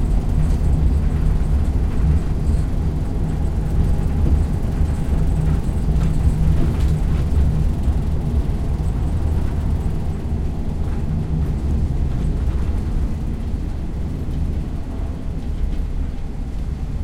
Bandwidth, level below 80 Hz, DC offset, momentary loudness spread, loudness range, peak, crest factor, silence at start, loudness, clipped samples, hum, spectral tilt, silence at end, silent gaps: 11 kHz; -20 dBFS; under 0.1%; 8 LU; 6 LU; -6 dBFS; 14 dB; 0 s; -22 LUFS; under 0.1%; none; -8.5 dB/octave; 0 s; none